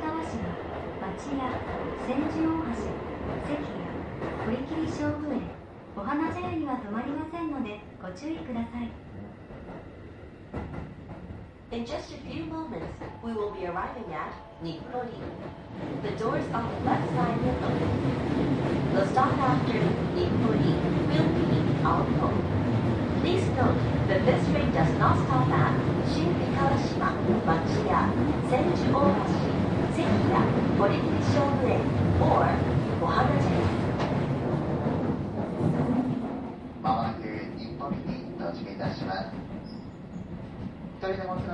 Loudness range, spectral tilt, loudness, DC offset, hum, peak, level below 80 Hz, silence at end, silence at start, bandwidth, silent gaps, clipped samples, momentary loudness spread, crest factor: 11 LU; -8 dB/octave; -28 LUFS; under 0.1%; none; -8 dBFS; -42 dBFS; 0 s; 0 s; 10 kHz; none; under 0.1%; 15 LU; 18 dB